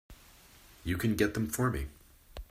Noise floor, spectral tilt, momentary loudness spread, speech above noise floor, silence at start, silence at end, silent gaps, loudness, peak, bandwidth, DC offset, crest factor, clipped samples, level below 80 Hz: -57 dBFS; -5.5 dB/octave; 18 LU; 27 dB; 0.1 s; 0.05 s; none; -32 LUFS; -14 dBFS; 16 kHz; under 0.1%; 20 dB; under 0.1%; -48 dBFS